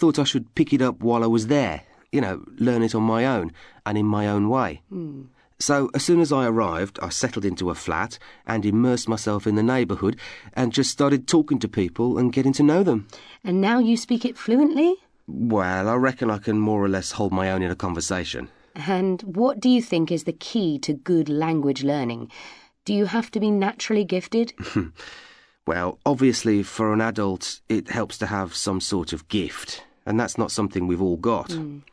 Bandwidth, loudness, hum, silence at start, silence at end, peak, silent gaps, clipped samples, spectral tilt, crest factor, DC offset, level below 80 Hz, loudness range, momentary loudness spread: 11 kHz; -23 LUFS; none; 0 s; 0.15 s; -6 dBFS; none; under 0.1%; -5.5 dB/octave; 16 dB; under 0.1%; -52 dBFS; 4 LU; 12 LU